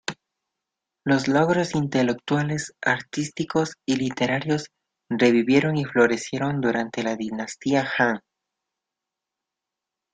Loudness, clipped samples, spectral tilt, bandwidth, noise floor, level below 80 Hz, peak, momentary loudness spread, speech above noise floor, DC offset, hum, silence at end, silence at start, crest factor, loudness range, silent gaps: -23 LUFS; under 0.1%; -5.5 dB/octave; 9.4 kHz; -86 dBFS; -62 dBFS; -4 dBFS; 9 LU; 64 dB; under 0.1%; none; 1.95 s; 0.1 s; 20 dB; 4 LU; none